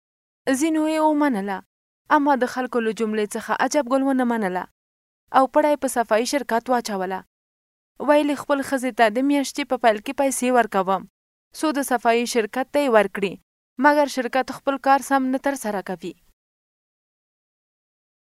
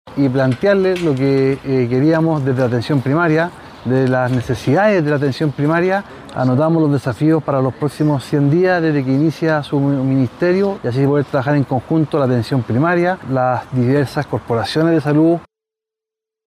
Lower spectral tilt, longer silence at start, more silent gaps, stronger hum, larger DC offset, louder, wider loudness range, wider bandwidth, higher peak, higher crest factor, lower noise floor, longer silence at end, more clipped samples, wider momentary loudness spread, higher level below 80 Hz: second, -4 dB/octave vs -8 dB/octave; first, 0.45 s vs 0.05 s; first, 1.66-2.05 s, 4.71-5.27 s, 7.27-7.95 s, 11.10-11.51 s, 13.43-13.76 s vs none; neither; neither; second, -21 LUFS vs -16 LUFS; about the same, 2 LU vs 1 LU; first, 16 kHz vs 12.5 kHz; about the same, -2 dBFS vs -2 dBFS; first, 20 dB vs 12 dB; first, under -90 dBFS vs -86 dBFS; first, 2.25 s vs 1.05 s; neither; first, 9 LU vs 4 LU; second, -64 dBFS vs -50 dBFS